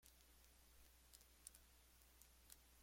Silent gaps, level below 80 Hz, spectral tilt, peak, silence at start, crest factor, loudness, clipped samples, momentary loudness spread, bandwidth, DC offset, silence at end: none; -74 dBFS; -1.5 dB/octave; -40 dBFS; 0 s; 30 dB; -66 LUFS; under 0.1%; 6 LU; 16.5 kHz; under 0.1%; 0 s